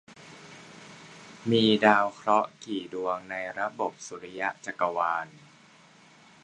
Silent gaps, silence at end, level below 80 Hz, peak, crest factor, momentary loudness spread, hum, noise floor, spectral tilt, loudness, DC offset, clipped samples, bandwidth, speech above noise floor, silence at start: none; 1.15 s; -72 dBFS; -2 dBFS; 26 dB; 25 LU; none; -56 dBFS; -5 dB/octave; -27 LUFS; under 0.1%; under 0.1%; 10 kHz; 29 dB; 0.1 s